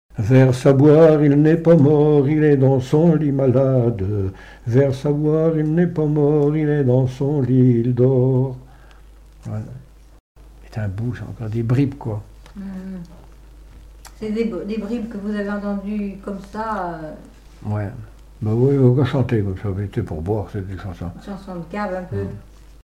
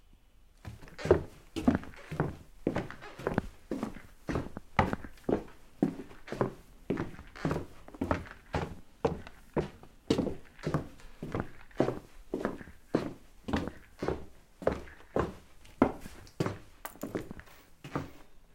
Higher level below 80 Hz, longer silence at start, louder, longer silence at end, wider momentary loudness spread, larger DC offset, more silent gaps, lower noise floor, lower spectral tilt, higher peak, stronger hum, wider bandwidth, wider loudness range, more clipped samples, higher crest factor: first, -44 dBFS vs -52 dBFS; about the same, 0.15 s vs 0.1 s; first, -18 LUFS vs -36 LUFS; first, 0.4 s vs 0 s; about the same, 18 LU vs 16 LU; neither; first, 10.20-10.35 s vs none; second, -44 dBFS vs -59 dBFS; first, -9.5 dB/octave vs -7 dB/octave; about the same, -4 dBFS vs -6 dBFS; neither; second, 9.6 kHz vs 16.5 kHz; first, 12 LU vs 3 LU; neither; second, 14 dB vs 30 dB